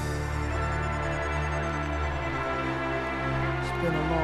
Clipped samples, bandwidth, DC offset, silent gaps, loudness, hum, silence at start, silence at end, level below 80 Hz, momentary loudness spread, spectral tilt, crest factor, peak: under 0.1%; 12.5 kHz; under 0.1%; none; -29 LUFS; none; 0 s; 0 s; -36 dBFS; 2 LU; -6.5 dB/octave; 14 dB; -14 dBFS